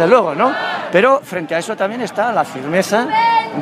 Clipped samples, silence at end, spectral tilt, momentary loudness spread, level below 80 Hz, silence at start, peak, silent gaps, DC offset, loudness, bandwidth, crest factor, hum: under 0.1%; 0 s; -4.5 dB/octave; 8 LU; -64 dBFS; 0 s; 0 dBFS; none; under 0.1%; -16 LUFS; 15.5 kHz; 16 dB; none